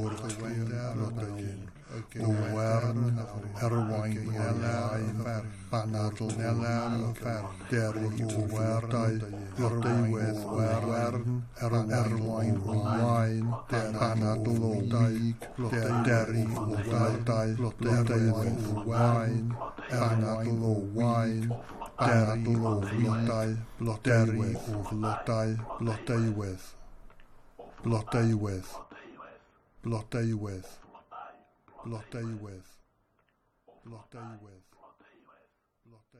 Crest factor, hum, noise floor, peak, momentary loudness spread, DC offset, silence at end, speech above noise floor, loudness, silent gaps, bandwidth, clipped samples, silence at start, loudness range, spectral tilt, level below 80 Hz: 16 dB; none; -72 dBFS; -14 dBFS; 14 LU; under 0.1%; 1.35 s; 43 dB; -30 LUFS; none; 12.5 kHz; under 0.1%; 0 s; 10 LU; -7.5 dB/octave; -54 dBFS